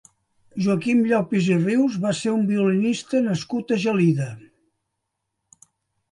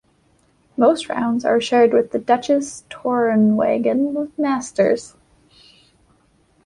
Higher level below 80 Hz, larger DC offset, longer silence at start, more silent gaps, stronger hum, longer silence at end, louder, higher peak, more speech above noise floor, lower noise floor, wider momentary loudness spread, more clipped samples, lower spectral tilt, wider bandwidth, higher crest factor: second, -66 dBFS vs -60 dBFS; neither; second, 0.55 s vs 0.8 s; neither; neither; first, 1.75 s vs 1.6 s; second, -21 LUFS vs -18 LUFS; second, -8 dBFS vs -2 dBFS; first, 58 dB vs 41 dB; first, -79 dBFS vs -59 dBFS; about the same, 7 LU vs 7 LU; neither; about the same, -6.5 dB/octave vs -5.5 dB/octave; about the same, 11.5 kHz vs 11 kHz; about the same, 14 dB vs 18 dB